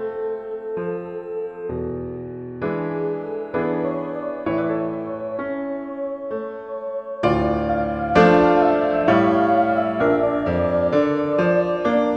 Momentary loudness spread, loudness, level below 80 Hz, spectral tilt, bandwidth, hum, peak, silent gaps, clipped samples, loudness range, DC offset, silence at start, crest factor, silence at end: 13 LU; -21 LUFS; -44 dBFS; -8 dB/octave; 8 kHz; none; -2 dBFS; none; under 0.1%; 9 LU; under 0.1%; 0 s; 18 dB; 0 s